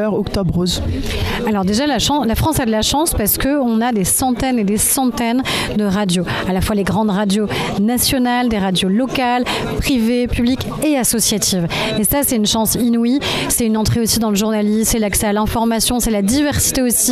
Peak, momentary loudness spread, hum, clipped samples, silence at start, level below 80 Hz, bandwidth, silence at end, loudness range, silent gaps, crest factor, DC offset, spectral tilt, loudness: -2 dBFS; 4 LU; none; under 0.1%; 0 s; -32 dBFS; 16 kHz; 0 s; 1 LU; none; 12 dB; under 0.1%; -4 dB/octave; -16 LUFS